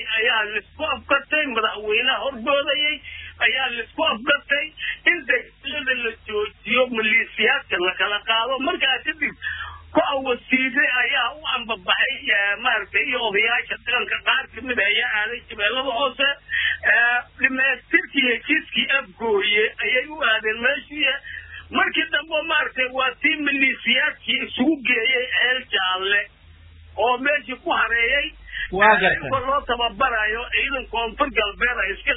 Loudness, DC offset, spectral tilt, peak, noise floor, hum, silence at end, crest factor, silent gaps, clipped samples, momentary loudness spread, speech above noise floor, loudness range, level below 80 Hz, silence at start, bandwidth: -20 LUFS; under 0.1%; -6 dB/octave; -2 dBFS; -47 dBFS; none; 0 s; 20 dB; none; under 0.1%; 7 LU; 25 dB; 2 LU; -48 dBFS; 0 s; 4 kHz